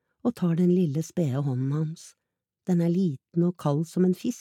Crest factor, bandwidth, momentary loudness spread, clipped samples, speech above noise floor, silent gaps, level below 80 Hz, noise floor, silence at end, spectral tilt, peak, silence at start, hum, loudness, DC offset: 14 dB; 13 kHz; 8 LU; under 0.1%; 40 dB; none; -74 dBFS; -65 dBFS; 0 s; -8.5 dB/octave; -12 dBFS; 0.25 s; none; -26 LUFS; under 0.1%